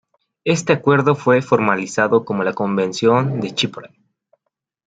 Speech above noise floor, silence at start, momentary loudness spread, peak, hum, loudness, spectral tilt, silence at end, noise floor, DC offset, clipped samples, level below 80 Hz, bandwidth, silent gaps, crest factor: 59 dB; 0.45 s; 6 LU; 0 dBFS; none; -17 LUFS; -5.5 dB/octave; 1 s; -76 dBFS; under 0.1%; under 0.1%; -62 dBFS; 9.2 kHz; none; 18 dB